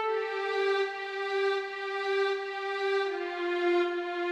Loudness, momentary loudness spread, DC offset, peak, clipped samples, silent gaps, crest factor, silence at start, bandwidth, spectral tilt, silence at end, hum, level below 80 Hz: -30 LUFS; 5 LU; under 0.1%; -18 dBFS; under 0.1%; none; 12 dB; 0 s; 9 kHz; -2 dB/octave; 0 s; none; under -90 dBFS